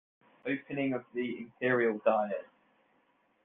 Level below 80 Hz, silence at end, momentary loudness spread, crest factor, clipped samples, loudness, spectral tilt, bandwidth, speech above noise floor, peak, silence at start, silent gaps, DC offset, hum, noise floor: -80 dBFS; 1 s; 10 LU; 20 dB; under 0.1%; -33 LUFS; -4.5 dB/octave; 3.9 kHz; 40 dB; -14 dBFS; 0.45 s; none; under 0.1%; none; -71 dBFS